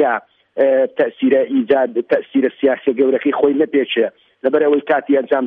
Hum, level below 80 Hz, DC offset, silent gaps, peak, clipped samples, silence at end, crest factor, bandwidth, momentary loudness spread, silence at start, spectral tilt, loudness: none; -64 dBFS; under 0.1%; none; -2 dBFS; under 0.1%; 0 s; 14 dB; 4 kHz; 4 LU; 0 s; -8 dB/octave; -16 LUFS